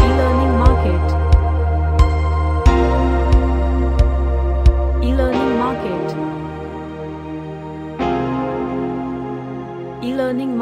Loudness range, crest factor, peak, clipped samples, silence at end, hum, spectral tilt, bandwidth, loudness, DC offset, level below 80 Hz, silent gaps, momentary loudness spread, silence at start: 8 LU; 16 dB; 0 dBFS; under 0.1%; 0 s; none; -8.5 dB/octave; 8.2 kHz; -18 LUFS; under 0.1%; -18 dBFS; none; 14 LU; 0 s